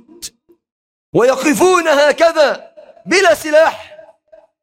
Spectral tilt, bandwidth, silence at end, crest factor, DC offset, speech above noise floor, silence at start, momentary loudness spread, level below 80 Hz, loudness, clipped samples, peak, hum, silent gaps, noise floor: -3 dB/octave; 16.5 kHz; 0.7 s; 14 dB; under 0.1%; 36 dB; 0.2 s; 21 LU; -56 dBFS; -12 LUFS; under 0.1%; -2 dBFS; none; 0.72-1.13 s; -48 dBFS